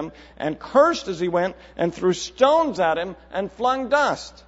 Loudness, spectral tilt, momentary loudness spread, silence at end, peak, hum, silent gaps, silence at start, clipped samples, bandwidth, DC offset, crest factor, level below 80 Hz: -22 LUFS; -4.5 dB/octave; 12 LU; 0.15 s; -4 dBFS; none; none; 0 s; under 0.1%; 8 kHz; under 0.1%; 18 dB; -52 dBFS